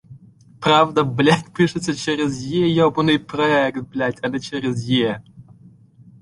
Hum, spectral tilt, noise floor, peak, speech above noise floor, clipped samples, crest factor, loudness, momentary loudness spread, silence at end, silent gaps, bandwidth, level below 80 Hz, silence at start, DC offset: none; -5.5 dB/octave; -48 dBFS; -2 dBFS; 29 dB; under 0.1%; 18 dB; -19 LUFS; 8 LU; 0.8 s; none; 11.5 kHz; -54 dBFS; 0.1 s; under 0.1%